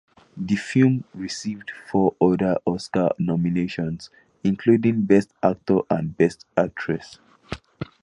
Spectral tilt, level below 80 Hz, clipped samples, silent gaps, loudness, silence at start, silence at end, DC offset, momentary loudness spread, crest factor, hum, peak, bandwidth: -7 dB/octave; -54 dBFS; under 0.1%; none; -22 LUFS; 0.35 s; 0.2 s; under 0.1%; 15 LU; 20 dB; none; -4 dBFS; 11 kHz